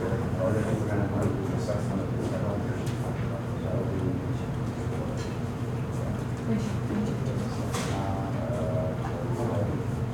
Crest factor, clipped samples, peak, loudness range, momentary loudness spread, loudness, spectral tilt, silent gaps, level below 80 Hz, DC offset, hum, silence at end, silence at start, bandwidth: 14 dB; under 0.1%; -14 dBFS; 2 LU; 4 LU; -30 LUFS; -7.5 dB/octave; none; -44 dBFS; under 0.1%; none; 0 s; 0 s; 16 kHz